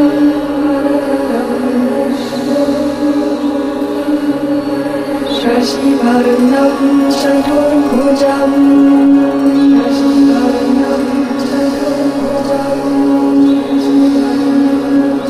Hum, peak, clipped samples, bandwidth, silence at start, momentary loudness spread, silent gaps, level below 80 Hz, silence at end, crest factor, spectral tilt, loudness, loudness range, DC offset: none; 0 dBFS; under 0.1%; 13.5 kHz; 0 s; 6 LU; none; -42 dBFS; 0 s; 10 dB; -5.5 dB/octave; -12 LUFS; 5 LU; under 0.1%